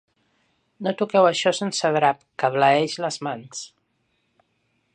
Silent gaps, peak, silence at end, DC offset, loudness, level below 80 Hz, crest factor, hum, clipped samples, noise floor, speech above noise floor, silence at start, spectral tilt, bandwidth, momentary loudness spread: none; -4 dBFS; 1.3 s; under 0.1%; -22 LUFS; -76 dBFS; 18 dB; none; under 0.1%; -70 dBFS; 49 dB; 0.8 s; -4 dB/octave; 10 kHz; 14 LU